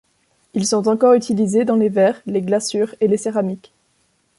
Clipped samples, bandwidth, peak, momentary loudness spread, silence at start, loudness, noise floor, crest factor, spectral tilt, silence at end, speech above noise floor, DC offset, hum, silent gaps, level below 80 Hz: under 0.1%; 11.5 kHz; -4 dBFS; 9 LU; 0.55 s; -18 LUFS; -63 dBFS; 14 dB; -5.5 dB/octave; 0.8 s; 46 dB; under 0.1%; none; none; -62 dBFS